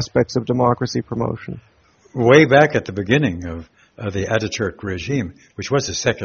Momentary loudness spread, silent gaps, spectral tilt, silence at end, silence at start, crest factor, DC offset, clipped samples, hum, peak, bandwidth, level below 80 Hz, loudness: 18 LU; none; -5 dB/octave; 0 s; 0 s; 18 dB; under 0.1%; under 0.1%; none; 0 dBFS; 7.2 kHz; -46 dBFS; -18 LUFS